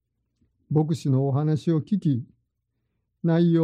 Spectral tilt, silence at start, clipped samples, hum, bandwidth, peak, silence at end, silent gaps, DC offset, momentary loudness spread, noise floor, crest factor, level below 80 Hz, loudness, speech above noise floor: -9 dB/octave; 0.7 s; under 0.1%; none; 9.8 kHz; -10 dBFS; 0 s; none; under 0.1%; 5 LU; -77 dBFS; 14 dB; -66 dBFS; -24 LUFS; 55 dB